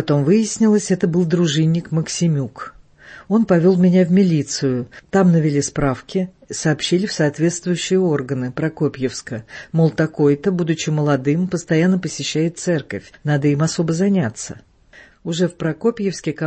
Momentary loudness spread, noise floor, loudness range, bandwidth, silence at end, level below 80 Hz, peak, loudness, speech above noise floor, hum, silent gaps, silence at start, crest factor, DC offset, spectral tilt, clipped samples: 10 LU; -47 dBFS; 4 LU; 8.8 kHz; 0 s; -50 dBFS; -4 dBFS; -18 LUFS; 30 dB; none; none; 0 s; 14 dB; under 0.1%; -6 dB/octave; under 0.1%